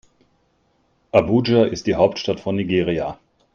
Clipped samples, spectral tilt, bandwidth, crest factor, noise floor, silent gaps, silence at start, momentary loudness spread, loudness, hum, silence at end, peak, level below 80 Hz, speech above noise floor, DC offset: under 0.1%; -6.5 dB/octave; 7.2 kHz; 20 dB; -63 dBFS; none; 1.15 s; 7 LU; -19 LUFS; none; 0.4 s; 0 dBFS; -50 dBFS; 45 dB; under 0.1%